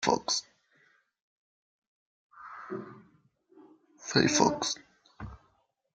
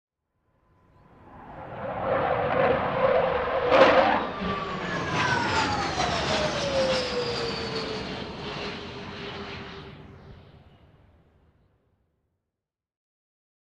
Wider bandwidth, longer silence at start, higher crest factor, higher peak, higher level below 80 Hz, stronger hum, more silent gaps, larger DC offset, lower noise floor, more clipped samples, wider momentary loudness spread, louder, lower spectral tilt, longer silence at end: about the same, 10.5 kHz vs 10 kHz; second, 0 s vs 1.25 s; first, 28 dB vs 22 dB; about the same, -6 dBFS vs -6 dBFS; second, -62 dBFS vs -50 dBFS; neither; first, 1.21-2.30 s vs none; neither; second, -72 dBFS vs -88 dBFS; neither; first, 23 LU vs 16 LU; second, -29 LUFS vs -25 LUFS; second, -3 dB/octave vs -4.5 dB/octave; second, 0.6 s vs 3.05 s